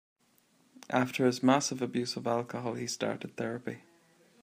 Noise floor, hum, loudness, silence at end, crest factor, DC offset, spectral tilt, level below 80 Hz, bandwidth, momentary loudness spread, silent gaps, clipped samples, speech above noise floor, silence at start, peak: -68 dBFS; none; -32 LUFS; 0.65 s; 22 dB; under 0.1%; -4.5 dB/octave; -78 dBFS; 15.5 kHz; 10 LU; none; under 0.1%; 37 dB; 0.9 s; -10 dBFS